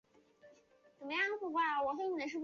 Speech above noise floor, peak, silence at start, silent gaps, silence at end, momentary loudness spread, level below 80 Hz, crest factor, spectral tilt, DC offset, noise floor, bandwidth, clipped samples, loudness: 31 dB; -24 dBFS; 0.45 s; none; 0 s; 5 LU; -82 dBFS; 14 dB; 0.5 dB/octave; under 0.1%; -67 dBFS; 7.2 kHz; under 0.1%; -36 LUFS